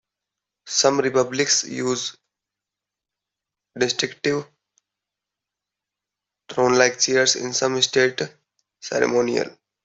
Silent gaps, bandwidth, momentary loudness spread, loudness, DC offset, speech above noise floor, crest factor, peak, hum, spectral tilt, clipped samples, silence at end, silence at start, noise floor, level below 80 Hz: none; 8.4 kHz; 12 LU; -20 LUFS; under 0.1%; 66 dB; 22 dB; -2 dBFS; 50 Hz at -65 dBFS; -2 dB/octave; under 0.1%; 0.35 s; 0.65 s; -87 dBFS; -66 dBFS